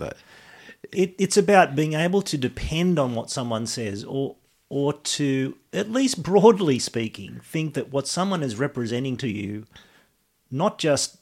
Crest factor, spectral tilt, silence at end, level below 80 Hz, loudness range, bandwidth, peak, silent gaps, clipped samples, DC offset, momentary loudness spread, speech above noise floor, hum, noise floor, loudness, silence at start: 22 dB; -5 dB/octave; 0.1 s; -50 dBFS; 5 LU; 16 kHz; -2 dBFS; none; under 0.1%; under 0.1%; 14 LU; 42 dB; none; -65 dBFS; -23 LUFS; 0 s